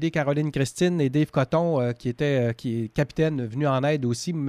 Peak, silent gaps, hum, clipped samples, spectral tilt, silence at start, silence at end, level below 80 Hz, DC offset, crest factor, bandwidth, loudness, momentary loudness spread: -8 dBFS; none; none; under 0.1%; -6.5 dB/octave; 0 s; 0 s; -52 dBFS; under 0.1%; 14 dB; 14 kHz; -24 LUFS; 4 LU